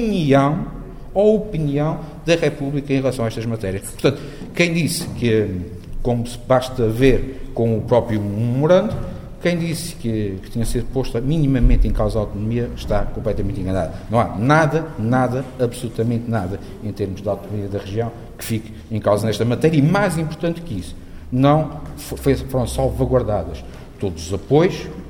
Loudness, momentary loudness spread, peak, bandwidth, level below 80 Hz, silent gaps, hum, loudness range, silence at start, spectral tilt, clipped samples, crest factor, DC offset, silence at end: -20 LUFS; 12 LU; 0 dBFS; 16.5 kHz; -30 dBFS; none; none; 3 LU; 0 s; -6.5 dB/octave; under 0.1%; 18 dB; under 0.1%; 0 s